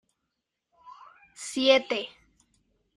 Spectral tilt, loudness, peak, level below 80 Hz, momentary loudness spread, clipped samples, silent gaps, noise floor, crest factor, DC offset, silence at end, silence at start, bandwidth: -1.5 dB/octave; -25 LUFS; -6 dBFS; -72 dBFS; 19 LU; under 0.1%; none; -83 dBFS; 24 dB; under 0.1%; 0.9 s; 0.85 s; 11.5 kHz